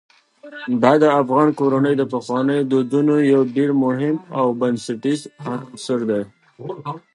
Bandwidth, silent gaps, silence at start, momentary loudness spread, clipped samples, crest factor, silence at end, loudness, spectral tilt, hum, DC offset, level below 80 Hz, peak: 11 kHz; none; 0.45 s; 15 LU; under 0.1%; 18 dB; 0.15 s; -18 LUFS; -7 dB/octave; none; under 0.1%; -70 dBFS; 0 dBFS